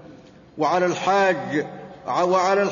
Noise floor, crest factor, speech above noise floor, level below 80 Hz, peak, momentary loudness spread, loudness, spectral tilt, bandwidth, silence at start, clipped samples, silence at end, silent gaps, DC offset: -46 dBFS; 14 dB; 26 dB; -64 dBFS; -8 dBFS; 8 LU; -21 LUFS; -5 dB/octave; 7.4 kHz; 0.05 s; under 0.1%; 0 s; none; under 0.1%